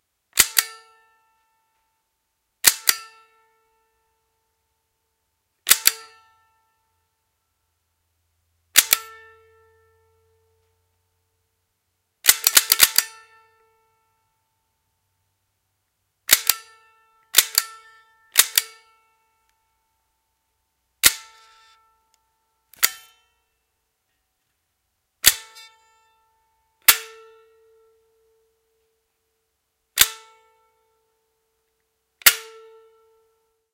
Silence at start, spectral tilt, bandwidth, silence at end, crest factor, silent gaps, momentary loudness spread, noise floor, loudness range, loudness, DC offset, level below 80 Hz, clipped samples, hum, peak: 0.35 s; 2.5 dB/octave; 16.5 kHz; 1.3 s; 26 dB; none; 18 LU; -75 dBFS; 7 LU; -17 LUFS; under 0.1%; -60 dBFS; under 0.1%; none; 0 dBFS